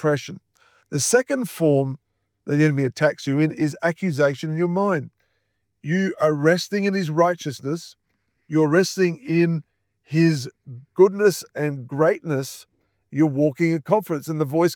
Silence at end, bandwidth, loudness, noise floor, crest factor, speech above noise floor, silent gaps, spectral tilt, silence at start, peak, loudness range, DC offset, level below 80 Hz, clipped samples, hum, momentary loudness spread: 0 s; over 20 kHz; -21 LUFS; -73 dBFS; 18 dB; 53 dB; none; -6 dB/octave; 0 s; -4 dBFS; 2 LU; under 0.1%; -72 dBFS; under 0.1%; none; 11 LU